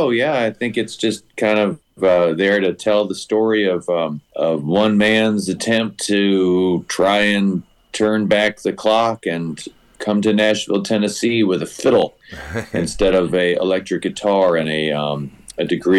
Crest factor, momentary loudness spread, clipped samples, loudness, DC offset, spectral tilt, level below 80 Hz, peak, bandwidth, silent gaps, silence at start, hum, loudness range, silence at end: 12 dB; 9 LU; under 0.1%; -18 LUFS; under 0.1%; -5 dB/octave; -46 dBFS; -6 dBFS; 12.5 kHz; none; 0 s; none; 2 LU; 0 s